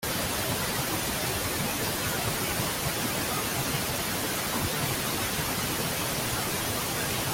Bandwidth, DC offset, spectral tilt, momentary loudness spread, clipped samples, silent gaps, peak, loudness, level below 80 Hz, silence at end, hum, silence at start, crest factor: 17 kHz; under 0.1%; -3 dB/octave; 0 LU; under 0.1%; none; -14 dBFS; -28 LUFS; -48 dBFS; 0 s; none; 0 s; 14 dB